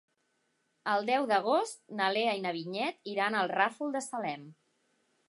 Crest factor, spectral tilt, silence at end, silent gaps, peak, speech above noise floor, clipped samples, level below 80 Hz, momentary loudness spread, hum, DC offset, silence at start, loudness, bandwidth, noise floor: 22 dB; -3.5 dB/octave; 0.75 s; none; -12 dBFS; 45 dB; under 0.1%; -88 dBFS; 9 LU; none; under 0.1%; 0.85 s; -31 LUFS; 11.5 kHz; -77 dBFS